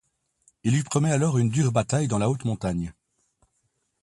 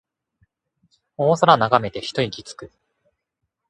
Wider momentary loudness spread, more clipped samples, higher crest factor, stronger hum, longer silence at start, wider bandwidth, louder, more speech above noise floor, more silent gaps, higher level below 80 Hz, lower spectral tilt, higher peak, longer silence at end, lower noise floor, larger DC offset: second, 8 LU vs 21 LU; neither; about the same, 18 dB vs 22 dB; neither; second, 0.65 s vs 1.2 s; about the same, 11.5 kHz vs 11.5 kHz; second, -24 LUFS vs -19 LUFS; second, 50 dB vs 59 dB; neither; first, -52 dBFS vs -58 dBFS; about the same, -6 dB/octave vs -5.5 dB/octave; second, -8 dBFS vs 0 dBFS; about the same, 1.1 s vs 1.05 s; second, -74 dBFS vs -79 dBFS; neither